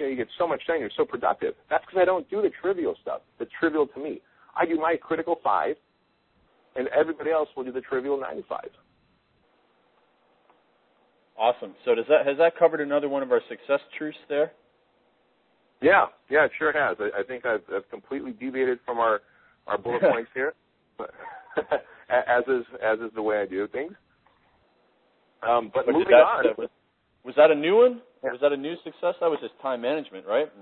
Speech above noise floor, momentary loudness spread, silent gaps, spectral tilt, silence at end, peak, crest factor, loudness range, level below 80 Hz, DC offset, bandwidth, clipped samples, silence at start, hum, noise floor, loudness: 43 dB; 15 LU; none; -9 dB/octave; 0.15 s; -4 dBFS; 22 dB; 7 LU; -68 dBFS; under 0.1%; 4.3 kHz; under 0.1%; 0 s; none; -67 dBFS; -25 LUFS